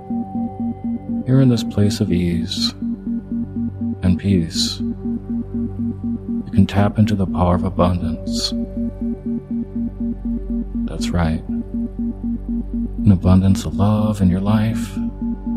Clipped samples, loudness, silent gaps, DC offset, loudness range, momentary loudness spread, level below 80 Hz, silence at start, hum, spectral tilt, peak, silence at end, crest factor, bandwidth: under 0.1%; -20 LUFS; none; under 0.1%; 5 LU; 9 LU; -32 dBFS; 0 s; none; -6.5 dB/octave; 0 dBFS; 0 s; 18 dB; 14.5 kHz